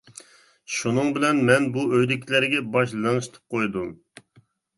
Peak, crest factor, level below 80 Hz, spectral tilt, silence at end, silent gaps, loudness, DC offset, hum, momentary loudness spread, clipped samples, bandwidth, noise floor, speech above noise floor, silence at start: -4 dBFS; 20 dB; -62 dBFS; -5 dB/octave; 0.85 s; none; -23 LUFS; under 0.1%; none; 10 LU; under 0.1%; 11.5 kHz; -60 dBFS; 37 dB; 0.7 s